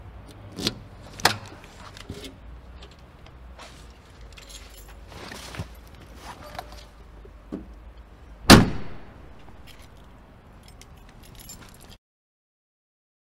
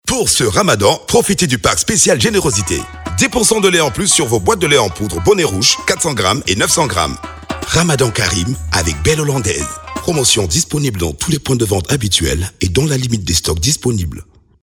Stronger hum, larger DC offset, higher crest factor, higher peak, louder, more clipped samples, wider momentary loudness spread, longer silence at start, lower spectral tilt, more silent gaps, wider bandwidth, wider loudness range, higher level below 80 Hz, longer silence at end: neither; neither; first, 28 dB vs 14 dB; about the same, 0 dBFS vs 0 dBFS; second, -20 LUFS vs -13 LUFS; neither; first, 24 LU vs 7 LU; about the same, 0.15 s vs 0.05 s; about the same, -4 dB/octave vs -3.5 dB/octave; neither; second, 16 kHz vs 19.5 kHz; first, 22 LU vs 3 LU; second, -40 dBFS vs -32 dBFS; first, 1.7 s vs 0.4 s